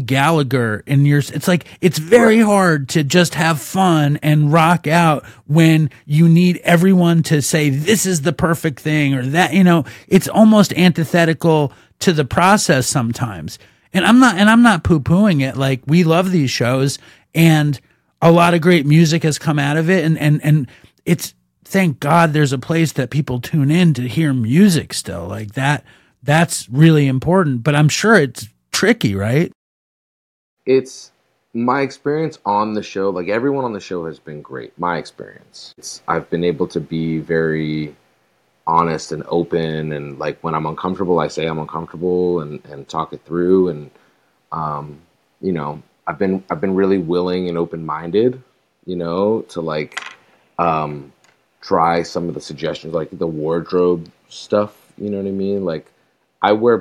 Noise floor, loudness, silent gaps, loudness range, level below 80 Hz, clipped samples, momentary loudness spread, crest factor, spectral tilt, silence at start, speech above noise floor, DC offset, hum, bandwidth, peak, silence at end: -61 dBFS; -16 LUFS; 29.55-30.57 s; 8 LU; -50 dBFS; under 0.1%; 15 LU; 16 dB; -6 dB/octave; 0 s; 45 dB; under 0.1%; none; 16 kHz; 0 dBFS; 0 s